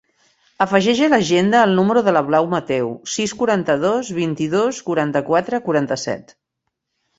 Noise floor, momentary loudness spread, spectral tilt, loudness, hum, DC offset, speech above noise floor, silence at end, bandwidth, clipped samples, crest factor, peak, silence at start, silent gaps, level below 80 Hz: -77 dBFS; 8 LU; -5 dB/octave; -18 LUFS; none; under 0.1%; 60 dB; 0.95 s; 8 kHz; under 0.1%; 16 dB; -2 dBFS; 0.6 s; none; -58 dBFS